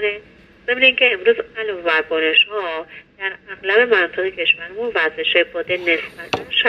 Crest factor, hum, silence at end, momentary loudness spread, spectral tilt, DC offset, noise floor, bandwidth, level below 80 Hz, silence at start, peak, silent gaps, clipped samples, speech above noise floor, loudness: 18 dB; none; 0 s; 13 LU; -3.5 dB/octave; under 0.1%; -44 dBFS; 7.4 kHz; -58 dBFS; 0 s; 0 dBFS; none; under 0.1%; 26 dB; -17 LUFS